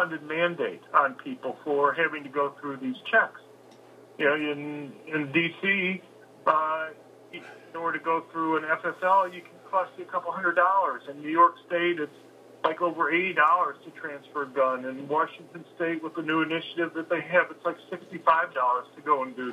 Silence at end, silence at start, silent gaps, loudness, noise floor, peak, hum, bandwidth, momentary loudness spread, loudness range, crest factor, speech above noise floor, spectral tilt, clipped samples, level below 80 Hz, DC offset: 0 s; 0 s; none; -27 LUFS; -52 dBFS; -6 dBFS; none; 12 kHz; 14 LU; 3 LU; 22 dB; 25 dB; -6 dB/octave; under 0.1%; under -90 dBFS; under 0.1%